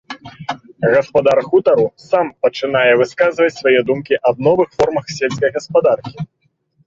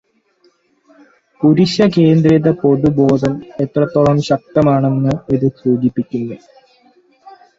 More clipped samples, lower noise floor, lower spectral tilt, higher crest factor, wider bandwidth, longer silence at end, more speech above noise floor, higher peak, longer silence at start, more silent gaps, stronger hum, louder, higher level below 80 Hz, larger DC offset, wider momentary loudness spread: neither; first, -60 dBFS vs -56 dBFS; second, -5.5 dB/octave vs -8 dB/octave; about the same, 14 dB vs 14 dB; about the same, 7.6 kHz vs 7.8 kHz; first, 0.6 s vs 0.3 s; about the same, 45 dB vs 43 dB; about the same, -2 dBFS vs 0 dBFS; second, 0.1 s vs 1.4 s; neither; neither; about the same, -15 LUFS vs -14 LUFS; second, -52 dBFS vs -46 dBFS; neither; first, 15 LU vs 10 LU